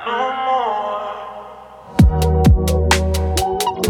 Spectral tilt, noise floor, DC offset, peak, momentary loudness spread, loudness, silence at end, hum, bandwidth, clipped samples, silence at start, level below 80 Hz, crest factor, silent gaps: -5.5 dB/octave; -37 dBFS; under 0.1%; 0 dBFS; 16 LU; -17 LUFS; 0 s; none; 17.5 kHz; under 0.1%; 0 s; -22 dBFS; 16 dB; none